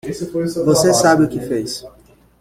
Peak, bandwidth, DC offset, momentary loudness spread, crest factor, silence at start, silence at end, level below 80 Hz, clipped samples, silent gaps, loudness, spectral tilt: -2 dBFS; 16 kHz; under 0.1%; 13 LU; 16 dB; 0.05 s; 0.5 s; -48 dBFS; under 0.1%; none; -16 LUFS; -4.5 dB/octave